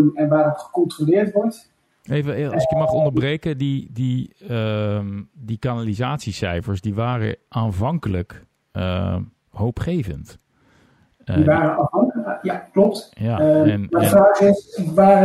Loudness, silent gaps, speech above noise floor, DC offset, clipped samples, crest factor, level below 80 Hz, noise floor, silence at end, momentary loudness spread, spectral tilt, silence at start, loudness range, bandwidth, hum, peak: -20 LUFS; none; 38 dB; under 0.1%; under 0.1%; 16 dB; -46 dBFS; -57 dBFS; 0 s; 11 LU; -7.5 dB/octave; 0 s; 8 LU; 12.5 kHz; none; -4 dBFS